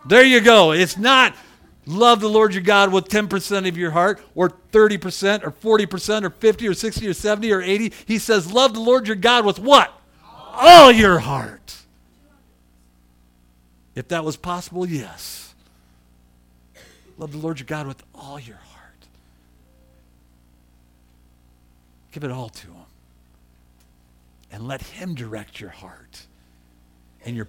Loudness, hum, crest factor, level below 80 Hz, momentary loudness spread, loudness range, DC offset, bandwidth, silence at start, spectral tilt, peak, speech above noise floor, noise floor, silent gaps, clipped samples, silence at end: -15 LUFS; 60 Hz at -50 dBFS; 18 dB; -48 dBFS; 23 LU; 24 LU; under 0.1%; 18 kHz; 0.05 s; -4 dB/octave; 0 dBFS; 39 dB; -56 dBFS; none; 0.2%; 0.05 s